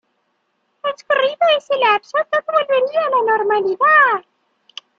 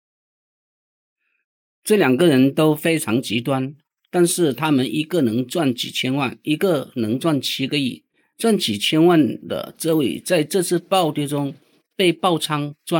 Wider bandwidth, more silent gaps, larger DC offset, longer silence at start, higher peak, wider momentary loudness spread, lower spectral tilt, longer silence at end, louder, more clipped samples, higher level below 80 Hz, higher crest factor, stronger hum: second, 7.4 kHz vs 18.5 kHz; neither; neither; second, 0.85 s vs 1.85 s; about the same, -2 dBFS vs -4 dBFS; first, 13 LU vs 10 LU; second, -3 dB/octave vs -5 dB/octave; first, 0.8 s vs 0 s; first, -16 LUFS vs -19 LUFS; neither; about the same, -72 dBFS vs -70 dBFS; about the same, 16 dB vs 16 dB; neither